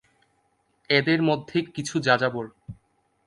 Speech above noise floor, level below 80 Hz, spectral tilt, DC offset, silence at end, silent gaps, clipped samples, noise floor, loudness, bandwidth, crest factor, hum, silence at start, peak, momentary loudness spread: 45 dB; -62 dBFS; -5 dB/octave; under 0.1%; 0.55 s; none; under 0.1%; -69 dBFS; -24 LUFS; 11.5 kHz; 22 dB; none; 0.9 s; -4 dBFS; 18 LU